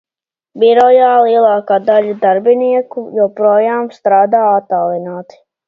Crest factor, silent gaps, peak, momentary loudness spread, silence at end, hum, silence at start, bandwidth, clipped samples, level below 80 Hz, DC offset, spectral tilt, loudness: 12 dB; none; 0 dBFS; 9 LU; 0.45 s; none; 0.55 s; 6.6 kHz; under 0.1%; -64 dBFS; under 0.1%; -7 dB/octave; -11 LUFS